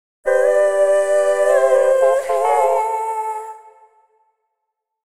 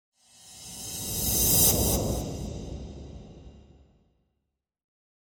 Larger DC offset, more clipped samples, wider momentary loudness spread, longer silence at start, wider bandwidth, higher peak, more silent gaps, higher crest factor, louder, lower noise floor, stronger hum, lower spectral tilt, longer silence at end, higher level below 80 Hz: neither; neither; second, 10 LU vs 25 LU; second, 0.25 s vs 0.45 s; second, 13.5 kHz vs 17.5 kHz; first, -4 dBFS vs -8 dBFS; neither; second, 14 dB vs 22 dB; first, -16 LUFS vs -24 LUFS; second, -78 dBFS vs -82 dBFS; neither; second, -1.5 dB/octave vs -3 dB/octave; second, 1.35 s vs 1.65 s; second, -64 dBFS vs -40 dBFS